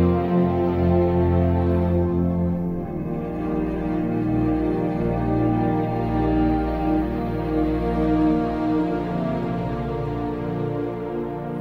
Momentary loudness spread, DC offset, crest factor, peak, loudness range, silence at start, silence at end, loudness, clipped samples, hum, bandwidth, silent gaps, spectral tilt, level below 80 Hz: 7 LU; under 0.1%; 14 dB; -8 dBFS; 2 LU; 0 s; 0 s; -23 LUFS; under 0.1%; none; 5.4 kHz; none; -10.5 dB/octave; -34 dBFS